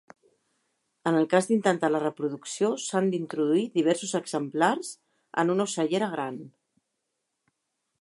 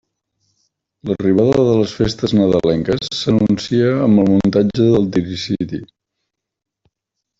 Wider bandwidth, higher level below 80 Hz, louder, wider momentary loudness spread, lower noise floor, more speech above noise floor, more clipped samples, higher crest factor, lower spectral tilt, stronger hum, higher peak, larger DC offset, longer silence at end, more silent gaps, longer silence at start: first, 11.5 kHz vs 7.8 kHz; second, -80 dBFS vs -44 dBFS; second, -27 LUFS vs -15 LUFS; about the same, 10 LU vs 9 LU; about the same, -81 dBFS vs -79 dBFS; second, 55 dB vs 64 dB; neither; first, 20 dB vs 14 dB; second, -5 dB/octave vs -7 dB/octave; neither; second, -8 dBFS vs -2 dBFS; neither; about the same, 1.55 s vs 1.55 s; neither; about the same, 1.05 s vs 1.05 s